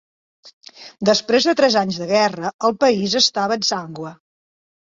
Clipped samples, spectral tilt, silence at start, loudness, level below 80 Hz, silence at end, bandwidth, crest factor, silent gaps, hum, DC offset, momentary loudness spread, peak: under 0.1%; -3.5 dB/octave; 0.45 s; -17 LUFS; -62 dBFS; 0.75 s; 8 kHz; 18 dB; 0.53-0.61 s, 2.54-2.59 s; none; under 0.1%; 10 LU; -2 dBFS